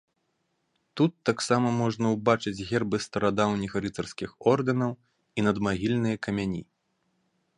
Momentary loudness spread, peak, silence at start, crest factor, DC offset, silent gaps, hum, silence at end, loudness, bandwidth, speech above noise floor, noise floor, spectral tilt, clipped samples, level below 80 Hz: 9 LU; -6 dBFS; 0.95 s; 22 dB; under 0.1%; none; none; 0.95 s; -27 LUFS; 11 kHz; 49 dB; -76 dBFS; -6 dB/octave; under 0.1%; -56 dBFS